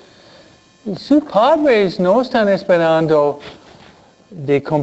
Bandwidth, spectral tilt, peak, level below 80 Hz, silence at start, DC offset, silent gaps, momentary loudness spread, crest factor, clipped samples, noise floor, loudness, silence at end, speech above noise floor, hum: 8.2 kHz; -7 dB/octave; -2 dBFS; -56 dBFS; 0.85 s; under 0.1%; none; 15 LU; 14 dB; under 0.1%; -47 dBFS; -15 LUFS; 0 s; 32 dB; none